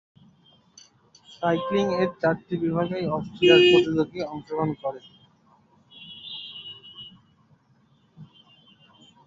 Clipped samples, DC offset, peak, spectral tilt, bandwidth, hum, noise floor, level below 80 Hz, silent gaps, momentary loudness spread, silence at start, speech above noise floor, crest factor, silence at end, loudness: under 0.1%; under 0.1%; -4 dBFS; -6 dB/octave; 7.6 kHz; none; -62 dBFS; -62 dBFS; none; 25 LU; 1.3 s; 39 dB; 22 dB; 1 s; -23 LUFS